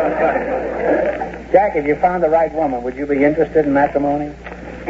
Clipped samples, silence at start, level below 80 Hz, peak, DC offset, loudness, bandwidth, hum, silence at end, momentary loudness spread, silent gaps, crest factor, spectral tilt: under 0.1%; 0 s; -40 dBFS; 0 dBFS; under 0.1%; -17 LUFS; 7.8 kHz; 60 Hz at -40 dBFS; 0 s; 8 LU; none; 16 dB; -8 dB/octave